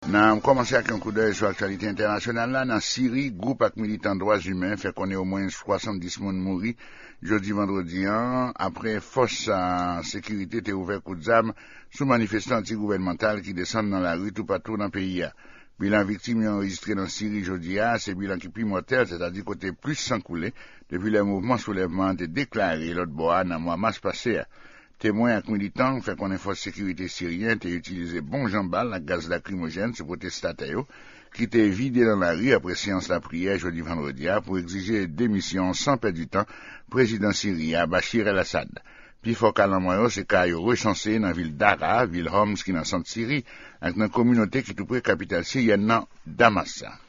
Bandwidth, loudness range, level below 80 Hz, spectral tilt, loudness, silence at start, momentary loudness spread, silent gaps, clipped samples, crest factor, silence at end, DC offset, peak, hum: 7.4 kHz; 5 LU; -52 dBFS; -4.5 dB/octave; -25 LUFS; 0 s; 9 LU; none; under 0.1%; 26 dB; 0.05 s; under 0.1%; 0 dBFS; none